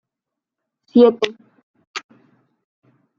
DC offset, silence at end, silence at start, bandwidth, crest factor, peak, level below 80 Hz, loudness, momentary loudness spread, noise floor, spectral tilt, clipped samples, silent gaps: under 0.1%; 1.2 s; 0.95 s; 7.4 kHz; 20 dB; -2 dBFS; -70 dBFS; -16 LUFS; 20 LU; -85 dBFS; -5 dB/octave; under 0.1%; 1.63-1.74 s, 1.87-1.94 s